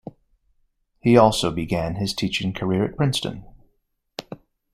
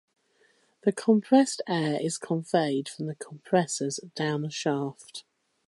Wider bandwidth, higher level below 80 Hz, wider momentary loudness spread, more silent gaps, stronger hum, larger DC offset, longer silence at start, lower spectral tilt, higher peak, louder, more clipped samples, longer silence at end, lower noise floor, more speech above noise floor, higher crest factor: first, 16 kHz vs 11.5 kHz; first, -48 dBFS vs -76 dBFS; first, 22 LU vs 14 LU; neither; neither; neither; first, 1.05 s vs 0.85 s; about the same, -5.5 dB/octave vs -5 dB/octave; first, -2 dBFS vs -8 dBFS; first, -21 LUFS vs -27 LUFS; neither; about the same, 0.4 s vs 0.45 s; about the same, -69 dBFS vs -66 dBFS; first, 49 dB vs 39 dB; about the same, 22 dB vs 20 dB